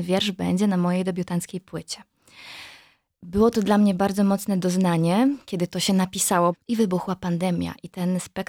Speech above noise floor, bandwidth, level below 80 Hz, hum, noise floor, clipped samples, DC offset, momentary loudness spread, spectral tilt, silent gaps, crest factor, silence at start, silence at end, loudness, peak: 31 dB; 17 kHz; -54 dBFS; none; -54 dBFS; under 0.1%; under 0.1%; 14 LU; -5.5 dB/octave; none; 16 dB; 0 s; 0.05 s; -23 LUFS; -6 dBFS